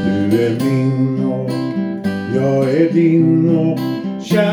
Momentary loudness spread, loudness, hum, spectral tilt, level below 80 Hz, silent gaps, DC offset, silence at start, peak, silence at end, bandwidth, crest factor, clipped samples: 8 LU; -16 LUFS; none; -8 dB/octave; -56 dBFS; none; under 0.1%; 0 s; -2 dBFS; 0 s; 19 kHz; 14 dB; under 0.1%